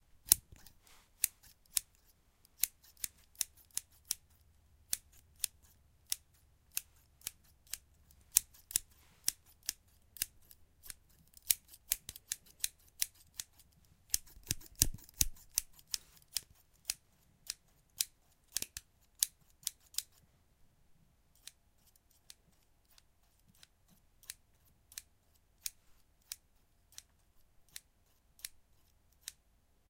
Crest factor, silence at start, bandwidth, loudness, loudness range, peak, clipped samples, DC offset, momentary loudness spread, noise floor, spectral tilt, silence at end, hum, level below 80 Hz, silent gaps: 42 dB; 0.25 s; 17 kHz; -38 LUFS; 15 LU; -2 dBFS; under 0.1%; under 0.1%; 21 LU; -71 dBFS; 0.5 dB/octave; 0.6 s; none; -58 dBFS; none